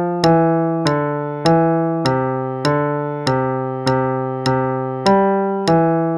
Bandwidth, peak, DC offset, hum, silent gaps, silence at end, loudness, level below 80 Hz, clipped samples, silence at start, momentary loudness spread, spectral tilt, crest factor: 11.5 kHz; 0 dBFS; under 0.1%; none; none; 0 s; -17 LUFS; -50 dBFS; under 0.1%; 0 s; 6 LU; -7 dB/octave; 16 dB